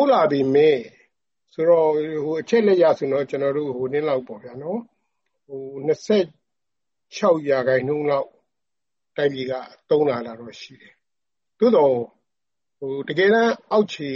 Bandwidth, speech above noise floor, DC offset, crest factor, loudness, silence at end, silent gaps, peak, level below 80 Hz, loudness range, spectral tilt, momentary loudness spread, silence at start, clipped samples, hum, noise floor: 7.4 kHz; 67 dB; under 0.1%; 16 dB; -21 LUFS; 0 s; none; -6 dBFS; -68 dBFS; 6 LU; -6.5 dB/octave; 18 LU; 0 s; under 0.1%; none; -88 dBFS